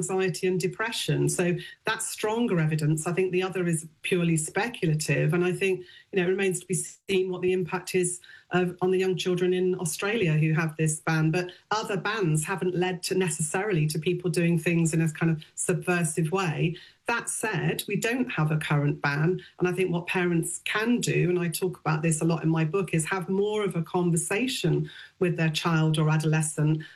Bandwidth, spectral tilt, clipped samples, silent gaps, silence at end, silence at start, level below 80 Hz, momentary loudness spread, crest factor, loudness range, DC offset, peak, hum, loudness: 14 kHz; -5 dB/octave; under 0.1%; none; 0.05 s; 0 s; -64 dBFS; 4 LU; 14 dB; 1 LU; under 0.1%; -12 dBFS; none; -26 LUFS